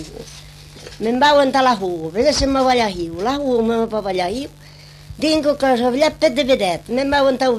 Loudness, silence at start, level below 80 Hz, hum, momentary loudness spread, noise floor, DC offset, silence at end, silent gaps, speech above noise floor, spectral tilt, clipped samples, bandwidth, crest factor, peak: -17 LUFS; 0 s; -40 dBFS; 50 Hz at -50 dBFS; 16 LU; -39 dBFS; under 0.1%; 0 s; none; 22 dB; -4 dB/octave; under 0.1%; 14 kHz; 14 dB; -2 dBFS